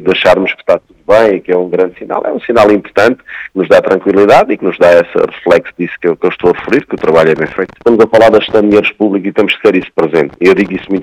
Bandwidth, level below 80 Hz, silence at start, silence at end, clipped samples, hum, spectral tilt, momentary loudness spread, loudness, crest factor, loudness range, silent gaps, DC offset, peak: 13 kHz; -44 dBFS; 0 s; 0 s; 2%; none; -6 dB/octave; 8 LU; -10 LUFS; 10 dB; 2 LU; none; under 0.1%; 0 dBFS